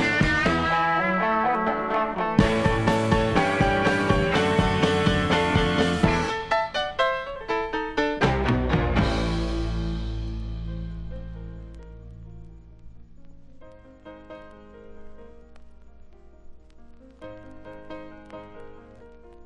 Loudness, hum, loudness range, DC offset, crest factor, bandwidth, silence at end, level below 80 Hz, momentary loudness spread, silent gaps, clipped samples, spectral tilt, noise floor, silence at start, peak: -23 LUFS; none; 23 LU; under 0.1%; 22 dB; 12 kHz; 0.05 s; -36 dBFS; 22 LU; none; under 0.1%; -6 dB/octave; -46 dBFS; 0 s; -4 dBFS